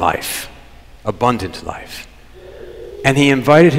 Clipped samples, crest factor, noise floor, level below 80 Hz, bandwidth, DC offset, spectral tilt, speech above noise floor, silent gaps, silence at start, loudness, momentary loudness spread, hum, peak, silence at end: under 0.1%; 16 dB; -40 dBFS; -42 dBFS; 16 kHz; under 0.1%; -5.5 dB/octave; 25 dB; none; 0 s; -16 LUFS; 22 LU; none; 0 dBFS; 0 s